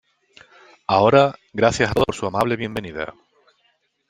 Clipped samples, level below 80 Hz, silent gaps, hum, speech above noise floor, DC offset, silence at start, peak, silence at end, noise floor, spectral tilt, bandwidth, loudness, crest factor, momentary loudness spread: under 0.1%; -48 dBFS; none; none; 47 dB; under 0.1%; 0.9 s; -2 dBFS; 1 s; -66 dBFS; -5.5 dB/octave; 13.5 kHz; -19 LUFS; 20 dB; 16 LU